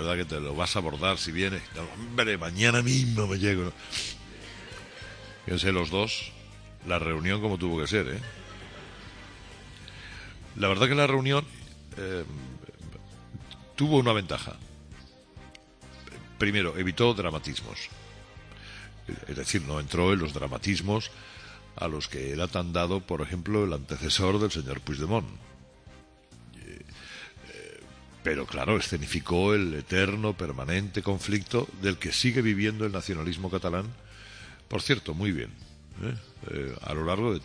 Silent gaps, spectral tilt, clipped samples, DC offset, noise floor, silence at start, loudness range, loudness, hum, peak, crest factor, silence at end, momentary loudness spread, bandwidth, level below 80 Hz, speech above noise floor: none; -5 dB/octave; under 0.1%; under 0.1%; -53 dBFS; 0 s; 5 LU; -28 LUFS; none; -6 dBFS; 24 dB; 0 s; 21 LU; 10.5 kHz; -48 dBFS; 25 dB